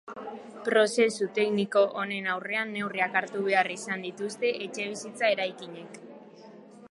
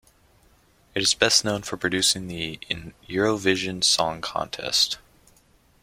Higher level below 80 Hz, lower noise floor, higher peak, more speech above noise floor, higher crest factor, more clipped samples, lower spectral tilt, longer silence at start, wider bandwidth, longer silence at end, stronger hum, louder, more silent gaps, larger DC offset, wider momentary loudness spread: second, -82 dBFS vs -54 dBFS; second, -49 dBFS vs -59 dBFS; second, -10 dBFS vs -2 dBFS; second, 21 dB vs 35 dB; about the same, 20 dB vs 24 dB; neither; first, -3.5 dB/octave vs -2 dB/octave; second, 0.05 s vs 0.95 s; second, 11.5 kHz vs 16.5 kHz; second, 0.05 s vs 0.85 s; neither; second, -28 LUFS vs -23 LUFS; neither; neither; first, 17 LU vs 12 LU